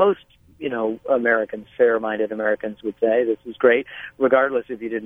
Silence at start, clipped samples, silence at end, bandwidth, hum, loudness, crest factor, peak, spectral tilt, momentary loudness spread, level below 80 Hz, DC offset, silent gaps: 0 s; under 0.1%; 0 s; 3.7 kHz; none; -21 LUFS; 18 dB; -2 dBFS; -7.5 dB/octave; 11 LU; -62 dBFS; under 0.1%; none